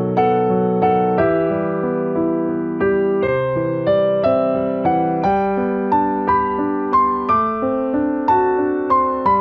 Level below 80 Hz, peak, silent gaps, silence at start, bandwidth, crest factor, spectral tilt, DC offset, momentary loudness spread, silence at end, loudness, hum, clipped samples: -46 dBFS; -4 dBFS; none; 0 s; 5.8 kHz; 12 dB; -10 dB/octave; under 0.1%; 4 LU; 0 s; -18 LUFS; none; under 0.1%